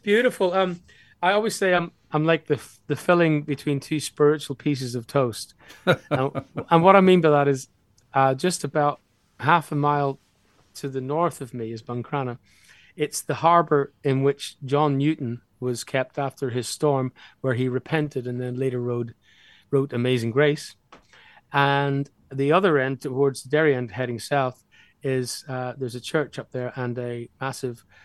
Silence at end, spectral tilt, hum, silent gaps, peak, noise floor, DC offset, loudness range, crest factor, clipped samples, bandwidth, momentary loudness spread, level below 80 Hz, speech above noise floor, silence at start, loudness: 0.3 s; -6 dB/octave; none; none; 0 dBFS; -62 dBFS; under 0.1%; 7 LU; 24 dB; under 0.1%; 12.5 kHz; 12 LU; -66 dBFS; 39 dB; 0.05 s; -24 LUFS